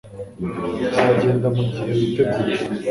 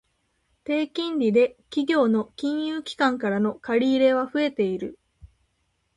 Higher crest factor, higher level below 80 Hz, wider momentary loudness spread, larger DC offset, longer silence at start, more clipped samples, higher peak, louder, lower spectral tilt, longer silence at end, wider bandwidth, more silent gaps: about the same, 18 dB vs 16 dB; first, -48 dBFS vs -62 dBFS; first, 11 LU vs 8 LU; neither; second, 0.05 s vs 0.7 s; neither; first, -2 dBFS vs -8 dBFS; first, -20 LUFS vs -24 LUFS; first, -7.5 dB/octave vs -6 dB/octave; second, 0 s vs 0.7 s; about the same, 11.5 kHz vs 11 kHz; neither